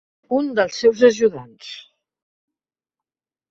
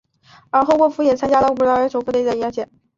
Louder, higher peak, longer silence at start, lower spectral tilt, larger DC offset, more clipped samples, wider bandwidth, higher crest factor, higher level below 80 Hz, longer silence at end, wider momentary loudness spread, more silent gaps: about the same, -18 LUFS vs -17 LUFS; about the same, -2 dBFS vs -4 dBFS; second, 0.3 s vs 0.55 s; second, -4 dB/octave vs -5.5 dB/octave; neither; neither; about the same, 7.6 kHz vs 7.6 kHz; first, 20 dB vs 14 dB; second, -64 dBFS vs -52 dBFS; first, 1.7 s vs 0.35 s; first, 21 LU vs 7 LU; neither